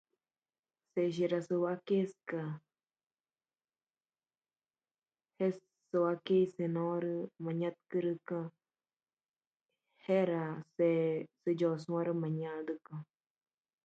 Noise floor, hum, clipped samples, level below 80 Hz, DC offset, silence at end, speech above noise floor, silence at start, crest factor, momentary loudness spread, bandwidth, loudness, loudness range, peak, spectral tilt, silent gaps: under -90 dBFS; none; under 0.1%; -84 dBFS; under 0.1%; 0.8 s; over 56 dB; 0.95 s; 18 dB; 11 LU; 7.8 kHz; -35 LUFS; 8 LU; -20 dBFS; -8.5 dB/octave; 9.47-9.51 s